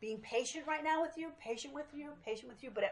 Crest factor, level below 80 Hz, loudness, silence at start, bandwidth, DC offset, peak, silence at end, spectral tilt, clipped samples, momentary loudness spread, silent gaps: 18 dB; -74 dBFS; -40 LUFS; 0 s; 11 kHz; under 0.1%; -22 dBFS; 0 s; -2.5 dB/octave; under 0.1%; 11 LU; none